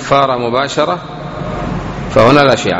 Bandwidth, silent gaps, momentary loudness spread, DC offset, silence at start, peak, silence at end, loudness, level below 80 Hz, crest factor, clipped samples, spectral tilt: 9.2 kHz; none; 14 LU; under 0.1%; 0 s; 0 dBFS; 0 s; -13 LUFS; -34 dBFS; 12 dB; 0.5%; -5.5 dB/octave